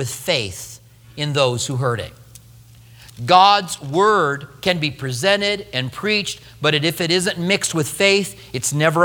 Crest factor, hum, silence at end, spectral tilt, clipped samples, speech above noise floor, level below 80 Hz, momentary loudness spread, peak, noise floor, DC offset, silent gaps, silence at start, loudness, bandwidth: 20 dB; none; 0 s; -3.5 dB/octave; under 0.1%; 26 dB; -52 dBFS; 12 LU; 0 dBFS; -45 dBFS; under 0.1%; none; 0 s; -18 LUFS; over 20 kHz